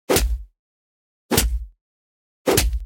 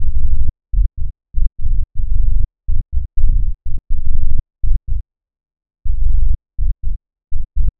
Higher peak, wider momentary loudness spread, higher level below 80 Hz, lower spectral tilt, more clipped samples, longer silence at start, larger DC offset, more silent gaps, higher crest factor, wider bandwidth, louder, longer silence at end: about the same, -2 dBFS vs 0 dBFS; about the same, 12 LU vs 10 LU; second, -28 dBFS vs -16 dBFS; second, -3.5 dB/octave vs -15.5 dB/octave; neither; about the same, 0.1 s vs 0 s; neither; first, 0.59-1.29 s, 1.81-2.45 s vs none; first, 22 dB vs 10 dB; first, 17 kHz vs 0.3 kHz; about the same, -22 LUFS vs -24 LUFS; about the same, 0 s vs 0.1 s